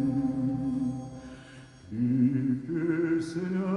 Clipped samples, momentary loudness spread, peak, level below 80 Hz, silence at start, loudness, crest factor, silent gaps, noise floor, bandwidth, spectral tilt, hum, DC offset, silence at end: under 0.1%; 20 LU; -16 dBFS; -58 dBFS; 0 s; -29 LUFS; 14 dB; none; -49 dBFS; 10.5 kHz; -8.5 dB/octave; none; under 0.1%; 0 s